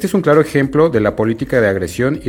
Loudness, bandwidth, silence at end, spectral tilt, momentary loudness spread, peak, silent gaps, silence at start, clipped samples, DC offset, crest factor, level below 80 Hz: -14 LUFS; 18 kHz; 0 s; -7 dB/octave; 5 LU; 0 dBFS; none; 0 s; under 0.1%; under 0.1%; 14 dB; -40 dBFS